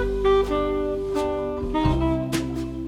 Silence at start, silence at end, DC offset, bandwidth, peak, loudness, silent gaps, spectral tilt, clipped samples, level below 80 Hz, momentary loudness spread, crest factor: 0 s; 0 s; under 0.1%; 14 kHz; -8 dBFS; -24 LUFS; none; -6.5 dB/octave; under 0.1%; -32 dBFS; 6 LU; 14 dB